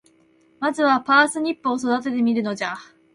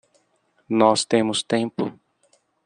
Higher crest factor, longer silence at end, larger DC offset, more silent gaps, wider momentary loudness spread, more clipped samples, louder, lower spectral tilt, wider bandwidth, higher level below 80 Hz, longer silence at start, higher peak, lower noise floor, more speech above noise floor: about the same, 18 dB vs 22 dB; second, 0.3 s vs 0.7 s; neither; neither; about the same, 11 LU vs 11 LU; neither; about the same, -21 LUFS vs -21 LUFS; about the same, -4 dB/octave vs -4 dB/octave; first, 11.5 kHz vs 10 kHz; about the same, -68 dBFS vs -68 dBFS; about the same, 0.6 s vs 0.7 s; about the same, -4 dBFS vs -2 dBFS; second, -58 dBFS vs -66 dBFS; second, 37 dB vs 46 dB